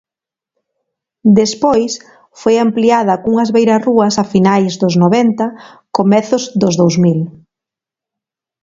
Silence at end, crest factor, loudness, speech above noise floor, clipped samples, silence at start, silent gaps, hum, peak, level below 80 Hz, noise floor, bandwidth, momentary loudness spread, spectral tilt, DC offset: 1.35 s; 14 dB; -12 LUFS; 76 dB; under 0.1%; 1.25 s; none; none; 0 dBFS; -52 dBFS; -87 dBFS; 7.8 kHz; 9 LU; -6 dB/octave; under 0.1%